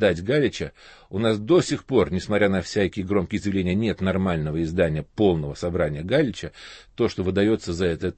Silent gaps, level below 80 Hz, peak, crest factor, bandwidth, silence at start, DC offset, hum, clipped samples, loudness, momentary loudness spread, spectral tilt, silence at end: none; -46 dBFS; -6 dBFS; 18 dB; 8.8 kHz; 0 s; under 0.1%; none; under 0.1%; -23 LUFS; 6 LU; -6.5 dB/octave; 0.05 s